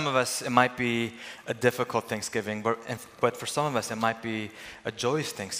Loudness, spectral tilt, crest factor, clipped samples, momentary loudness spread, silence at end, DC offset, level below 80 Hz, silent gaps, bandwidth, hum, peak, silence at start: -29 LUFS; -4 dB/octave; 24 dB; under 0.1%; 11 LU; 0 s; under 0.1%; -68 dBFS; none; 16 kHz; none; -4 dBFS; 0 s